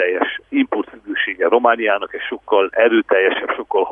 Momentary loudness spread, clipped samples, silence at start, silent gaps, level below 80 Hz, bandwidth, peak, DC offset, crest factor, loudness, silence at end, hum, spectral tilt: 9 LU; under 0.1%; 0 s; none; -60 dBFS; 3.7 kHz; 0 dBFS; under 0.1%; 16 dB; -17 LUFS; 0 s; 50 Hz at -60 dBFS; -6.5 dB/octave